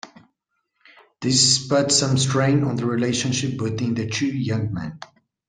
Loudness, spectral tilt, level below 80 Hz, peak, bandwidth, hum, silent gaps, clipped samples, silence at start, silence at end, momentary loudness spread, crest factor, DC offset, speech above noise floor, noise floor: -20 LUFS; -4 dB/octave; -56 dBFS; -4 dBFS; 10 kHz; none; none; under 0.1%; 0.05 s; 0.45 s; 12 LU; 18 dB; under 0.1%; 54 dB; -75 dBFS